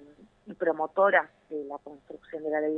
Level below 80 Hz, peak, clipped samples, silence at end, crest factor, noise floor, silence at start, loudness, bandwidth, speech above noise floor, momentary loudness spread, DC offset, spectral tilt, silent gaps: -74 dBFS; -8 dBFS; under 0.1%; 0 s; 22 dB; -52 dBFS; 0 s; -28 LUFS; 3.9 kHz; 23 dB; 23 LU; under 0.1%; -7.5 dB/octave; none